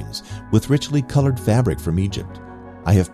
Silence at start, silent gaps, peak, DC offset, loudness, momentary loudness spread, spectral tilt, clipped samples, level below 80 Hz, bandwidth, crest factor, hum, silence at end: 0 s; none; -4 dBFS; under 0.1%; -20 LUFS; 14 LU; -7 dB/octave; under 0.1%; -38 dBFS; 14.5 kHz; 16 dB; none; 0 s